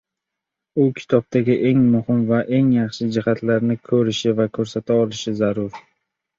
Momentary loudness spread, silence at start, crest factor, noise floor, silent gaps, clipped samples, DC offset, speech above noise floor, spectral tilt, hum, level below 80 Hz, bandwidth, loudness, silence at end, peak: 5 LU; 0.75 s; 18 dB; -83 dBFS; none; under 0.1%; under 0.1%; 65 dB; -7 dB/octave; none; -56 dBFS; 7.6 kHz; -19 LUFS; 0.6 s; -2 dBFS